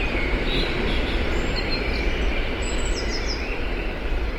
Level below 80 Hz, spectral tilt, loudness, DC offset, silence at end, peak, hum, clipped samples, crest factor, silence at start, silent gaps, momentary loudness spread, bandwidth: -26 dBFS; -4.5 dB/octave; -25 LUFS; under 0.1%; 0 s; -10 dBFS; none; under 0.1%; 14 dB; 0 s; none; 4 LU; 11 kHz